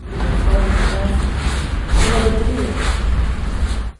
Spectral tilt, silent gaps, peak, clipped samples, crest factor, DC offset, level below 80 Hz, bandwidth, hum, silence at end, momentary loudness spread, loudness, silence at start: -5.5 dB/octave; none; -4 dBFS; under 0.1%; 14 dB; under 0.1%; -18 dBFS; 11.5 kHz; none; 0.05 s; 5 LU; -19 LUFS; 0 s